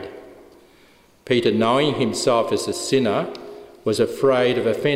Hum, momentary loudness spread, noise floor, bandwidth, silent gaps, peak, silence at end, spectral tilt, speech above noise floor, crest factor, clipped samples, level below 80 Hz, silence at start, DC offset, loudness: none; 12 LU; -53 dBFS; 16 kHz; none; -6 dBFS; 0 s; -4.5 dB/octave; 34 dB; 16 dB; under 0.1%; -60 dBFS; 0 s; under 0.1%; -20 LUFS